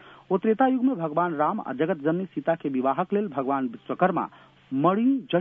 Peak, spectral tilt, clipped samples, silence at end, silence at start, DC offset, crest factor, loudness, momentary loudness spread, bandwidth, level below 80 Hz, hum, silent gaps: -8 dBFS; -10 dB/octave; under 0.1%; 0 s; 0.05 s; under 0.1%; 16 dB; -25 LUFS; 7 LU; 3.8 kHz; -72 dBFS; none; none